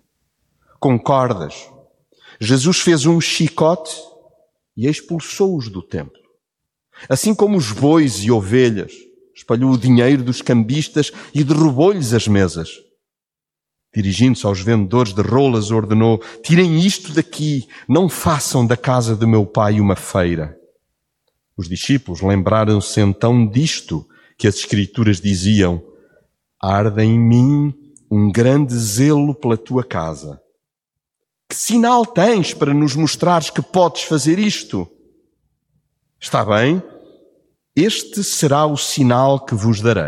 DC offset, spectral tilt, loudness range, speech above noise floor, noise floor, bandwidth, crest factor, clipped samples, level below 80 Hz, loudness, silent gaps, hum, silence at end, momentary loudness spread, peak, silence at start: under 0.1%; -5.5 dB/octave; 4 LU; 72 dB; -87 dBFS; 15.5 kHz; 16 dB; under 0.1%; -48 dBFS; -16 LUFS; none; none; 0 s; 11 LU; -2 dBFS; 0.8 s